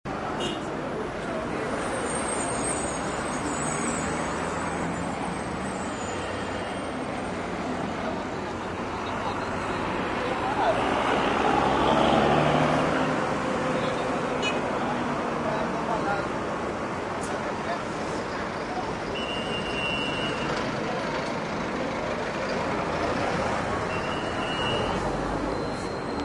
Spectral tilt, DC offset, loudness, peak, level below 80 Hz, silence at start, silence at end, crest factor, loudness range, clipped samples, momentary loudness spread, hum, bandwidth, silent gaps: -4.5 dB/octave; under 0.1%; -28 LUFS; -8 dBFS; -48 dBFS; 0.05 s; 0 s; 20 dB; 7 LU; under 0.1%; 8 LU; none; 11.5 kHz; none